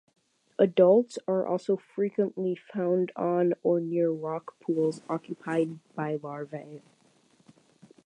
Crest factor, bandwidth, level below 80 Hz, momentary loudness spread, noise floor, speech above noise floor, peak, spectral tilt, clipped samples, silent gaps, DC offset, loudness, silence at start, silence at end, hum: 20 dB; 10 kHz; -82 dBFS; 13 LU; -64 dBFS; 37 dB; -8 dBFS; -8 dB/octave; under 0.1%; none; under 0.1%; -28 LUFS; 0.6 s; 1.3 s; none